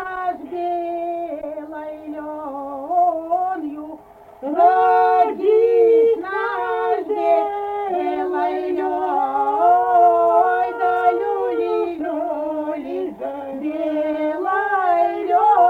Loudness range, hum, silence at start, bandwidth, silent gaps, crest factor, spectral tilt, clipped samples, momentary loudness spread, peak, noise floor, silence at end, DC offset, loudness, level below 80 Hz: 7 LU; none; 0 s; 4.7 kHz; none; 14 dB; -6 dB/octave; under 0.1%; 15 LU; -4 dBFS; -41 dBFS; 0 s; under 0.1%; -19 LUFS; -60 dBFS